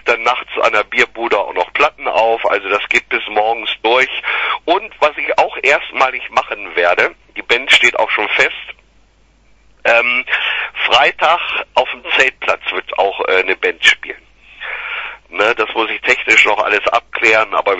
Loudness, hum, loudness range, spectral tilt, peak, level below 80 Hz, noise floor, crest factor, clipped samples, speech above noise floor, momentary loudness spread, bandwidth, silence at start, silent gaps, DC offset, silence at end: -13 LUFS; none; 2 LU; -1.5 dB/octave; 0 dBFS; -52 dBFS; -51 dBFS; 16 dB; under 0.1%; 37 dB; 8 LU; 11 kHz; 0.05 s; none; under 0.1%; 0 s